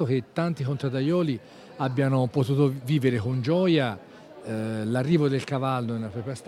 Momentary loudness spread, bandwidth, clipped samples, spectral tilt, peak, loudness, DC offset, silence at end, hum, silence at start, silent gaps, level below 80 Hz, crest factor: 9 LU; 12.5 kHz; under 0.1%; -7.5 dB/octave; -10 dBFS; -26 LUFS; under 0.1%; 0 s; none; 0 s; none; -64 dBFS; 16 dB